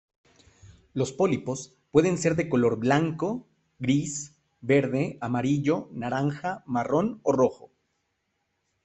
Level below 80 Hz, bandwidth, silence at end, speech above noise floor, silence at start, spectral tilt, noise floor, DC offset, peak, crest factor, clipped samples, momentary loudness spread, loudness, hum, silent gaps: -62 dBFS; 8.4 kHz; 1.3 s; 51 dB; 0.65 s; -6 dB/octave; -77 dBFS; under 0.1%; -6 dBFS; 20 dB; under 0.1%; 10 LU; -26 LUFS; none; none